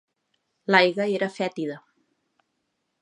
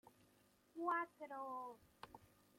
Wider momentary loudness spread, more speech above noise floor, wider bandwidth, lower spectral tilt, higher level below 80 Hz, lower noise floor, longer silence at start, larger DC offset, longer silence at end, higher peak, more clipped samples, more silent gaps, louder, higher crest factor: about the same, 17 LU vs 19 LU; first, 54 dB vs 28 dB; second, 11 kHz vs 16.5 kHz; about the same, -5.5 dB/octave vs -5 dB/octave; about the same, -82 dBFS vs -84 dBFS; about the same, -77 dBFS vs -75 dBFS; first, 0.7 s vs 0.05 s; neither; first, 1.25 s vs 0.35 s; first, -2 dBFS vs -30 dBFS; neither; neither; first, -23 LUFS vs -46 LUFS; first, 26 dB vs 20 dB